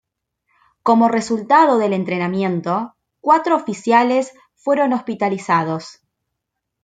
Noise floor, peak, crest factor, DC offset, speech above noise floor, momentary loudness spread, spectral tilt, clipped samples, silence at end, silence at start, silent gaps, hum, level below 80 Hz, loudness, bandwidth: -78 dBFS; -2 dBFS; 16 dB; under 0.1%; 62 dB; 11 LU; -6 dB/octave; under 0.1%; 0.9 s; 0.85 s; none; none; -66 dBFS; -17 LUFS; 9.2 kHz